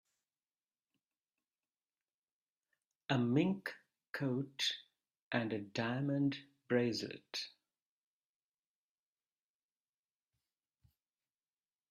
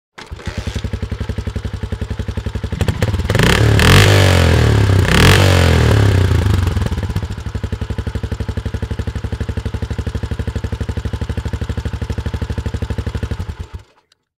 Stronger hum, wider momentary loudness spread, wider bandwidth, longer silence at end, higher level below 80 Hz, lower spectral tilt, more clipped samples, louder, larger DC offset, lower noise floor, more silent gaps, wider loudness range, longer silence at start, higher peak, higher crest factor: neither; about the same, 14 LU vs 15 LU; second, 13 kHz vs 16 kHz; first, 4.4 s vs 0.6 s; second, -82 dBFS vs -24 dBFS; about the same, -5.5 dB/octave vs -5.5 dB/octave; neither; second, -38 LUFS vs -16 LUFS; neither; first, under -90 dBFS vs -56 dBFS; first, 4.10-4.14 s, 5.22-5.31 s vs none; second, 8 LU vs 12 LU; first, 3.1 s vs 0.2 s; second, -20 dBFS vs -2 dBFS; first, 22 dB vs 14 dB